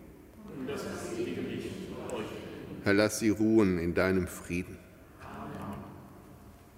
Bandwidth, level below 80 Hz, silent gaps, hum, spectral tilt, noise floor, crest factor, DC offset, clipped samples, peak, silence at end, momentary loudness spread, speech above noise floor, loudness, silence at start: 16 kHz; -56 dBFS; none; none; -5.5 dB/octave; -53 dBFS; 22 dB; under 0.1%; under 0.1%; -10 dBFS; 0 s; 24 LU; 25 dB; -32 LUFS; 0 s